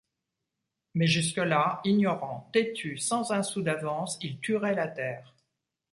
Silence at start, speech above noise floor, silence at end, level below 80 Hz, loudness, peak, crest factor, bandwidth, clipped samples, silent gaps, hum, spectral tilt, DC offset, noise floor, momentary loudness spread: 0.95 s; 57 dB; 0.7 s; -70 dBFS; -29 LUFS; -12 dBFS; 18 dB; 11.5 kHz; under 0.1%; none; none; -4.5 dB/octave; under 0.1%; -85 dBFS; 9 LU